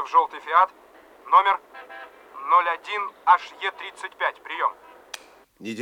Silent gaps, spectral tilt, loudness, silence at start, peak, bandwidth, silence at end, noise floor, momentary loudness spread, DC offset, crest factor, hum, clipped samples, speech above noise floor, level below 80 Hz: none; -2.5 dB/octave; -22 LUFS; 0 s; -4 dBFS; 12.5 kHz; 0 s; -48 dBFS; 21 LU; under 0.1%; 20 dB; none; under 0.1%; 25 dB; -74 dBFS